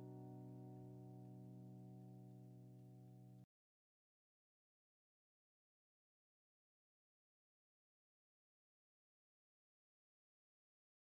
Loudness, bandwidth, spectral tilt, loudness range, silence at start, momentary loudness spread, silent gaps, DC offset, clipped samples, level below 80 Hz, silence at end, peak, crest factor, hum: -60 LUFS; 15 kHz; -9.5 dB/octave; 8 LU; 0 s; 6 LU; none; under 0.1%; under 0.1%; under -90 dBFS; 7.65 s; -46 dBFS; 16 dB; none